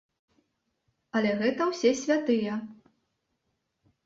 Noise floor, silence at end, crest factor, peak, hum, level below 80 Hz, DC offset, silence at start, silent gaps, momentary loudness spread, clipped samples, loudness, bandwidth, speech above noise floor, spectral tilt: -79 dBFS; 1.3 s; 18 dB; -12 dBFS; none; -72 dBFS; under 0.1%; 1.15 s; none; 9 LU; under 0.1%; -27 LUFS; 7.8 kHz; 53 dB; -4.5 dB/octave